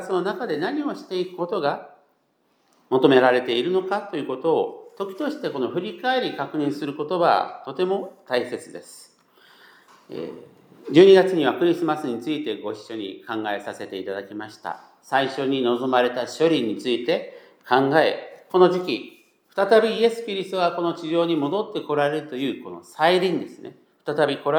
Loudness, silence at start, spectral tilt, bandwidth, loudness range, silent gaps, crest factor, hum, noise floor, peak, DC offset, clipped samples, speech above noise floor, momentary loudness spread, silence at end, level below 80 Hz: -22 LUFS; 0 s; -6 dB/octave; 14.5 kHz; 7 LU; none; 20 dB; none; -67 dBFS; -2 dBFS; under 0.1%; under 0.1%; 45 dB; 16 LU; 0 s; -84 dBFS